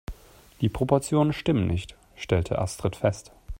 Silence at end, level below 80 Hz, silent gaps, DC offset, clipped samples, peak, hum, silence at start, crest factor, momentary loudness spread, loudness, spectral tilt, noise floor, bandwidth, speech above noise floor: 0.05 s; -44 dBFS; none; under 0.1%; under 0.1%; -6 dBFS; none; 0.1 s; 20 dB; 16 LU; -26 LUFS; -6.5 dB/octave; -46 dBFS; 16.5 kHz; 21 dB